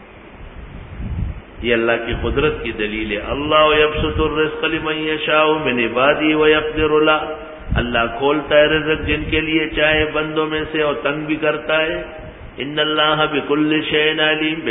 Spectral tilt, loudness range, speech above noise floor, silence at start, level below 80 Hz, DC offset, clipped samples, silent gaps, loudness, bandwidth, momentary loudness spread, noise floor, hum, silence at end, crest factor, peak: -10.5 dB/octave; 3 LU; 20 dB; 0 s; -34 dBFS; under 0.1%; under 0.1%; none; -17 LUFS; 3.9 kHz; 13 LU; -37 dBFS; none; 0 s; 18 dB; 0 dBFS